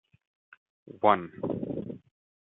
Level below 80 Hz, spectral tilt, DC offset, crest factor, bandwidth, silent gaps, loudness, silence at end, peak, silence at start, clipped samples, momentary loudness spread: -68 dBFS; -10 dB/octave; under 0.1%; 26 dB; 4 kHz; none; -29 LUFS; 0.5 s; -6 dBFS; 0.95 s; under 0.1%; 17 LU